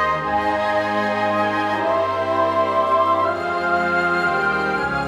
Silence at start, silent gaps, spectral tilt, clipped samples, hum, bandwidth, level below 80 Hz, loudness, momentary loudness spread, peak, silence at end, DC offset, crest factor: 0 s; none; -5.5 dB/octave; under 0.1%; none; 13 kHz; -50 dBFS; -19 LUFS; 3 LU; -6 dBFS; 0 s; under 0.1%; 12 dB